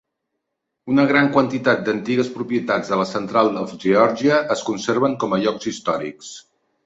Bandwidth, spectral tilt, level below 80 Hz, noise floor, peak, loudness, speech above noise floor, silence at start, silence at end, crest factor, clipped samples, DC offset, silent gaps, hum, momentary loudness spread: 8 kHz; -5.5 dB/octave; -60 dBFS; -78 dBFS; -2 dBFS; -19 LUFS; 59 dB; 0.85 s; 0.45 s; 18 dB; under 0.1%; under 0.1%; none; none; 9 LU